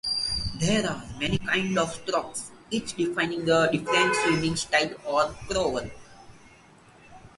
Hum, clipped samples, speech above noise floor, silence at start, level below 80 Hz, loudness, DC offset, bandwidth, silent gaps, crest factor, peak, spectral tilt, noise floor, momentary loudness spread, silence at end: none; under 0.1%; 28 dB; 0.05 s; -48 dBFS; -26 LUFS; under 0.1%; 11.5 kHz; none; 20 dB; -8 dBFS; -4 dB/octave; -54 dBFS; 9 LU; 0.1 s